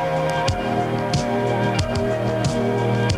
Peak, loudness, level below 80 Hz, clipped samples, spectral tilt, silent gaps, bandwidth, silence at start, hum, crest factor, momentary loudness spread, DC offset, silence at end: -4 dBFS; -21 LUFS; -38 dBFS; under 0.1%; -6 dB/octave; none; 13 kHz; 0 s; none; 16 dB; 2 LU; under 0.1%; 0 s